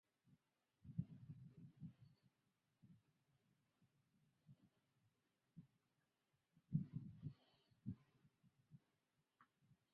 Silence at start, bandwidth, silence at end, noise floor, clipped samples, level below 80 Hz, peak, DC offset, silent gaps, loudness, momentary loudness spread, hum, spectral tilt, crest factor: 0.25 s; 4.8 kHz; 0.2 s; -89 dBFS; under 0.1%; -80 dBFS; -30 dBFS; under 0.1%; none; -54 LUFS; 21 LU; none; -10.5 dB/octave; 30 dB